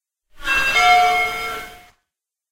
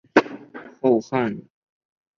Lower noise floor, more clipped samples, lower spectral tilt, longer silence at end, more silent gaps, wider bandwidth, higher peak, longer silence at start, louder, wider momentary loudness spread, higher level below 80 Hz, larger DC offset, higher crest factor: first, -81 dBFS vs -40 dBFS; neither; second, -0.5 dB/octave vs -6.5 dB/octave; about the same, 0.75 s vs 0.75 s; neither; first, 16 kHz vs 7.2 kHz; about the same, -2 dBFS vs -2 dBFS; first, 0.35 s vs 0.15 s; first, -16 LUFS vs -22 LUFS; about the same, 17 LU vs 18 LU; first, -44 dBFS vs -64 dBFS; neither; about the same, 18 dB vs 22 dB